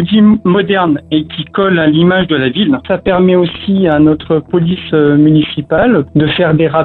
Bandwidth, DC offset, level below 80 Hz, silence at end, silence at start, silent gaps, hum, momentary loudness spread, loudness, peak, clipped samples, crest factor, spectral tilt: 4.3 kHz; under 0.1%; -38 dBFS; 0 s; 0 s; none; none; 6 LU; -11 LUFS; 0 dBFS; under 0.1%; 10 dB; -10.5 dB/octave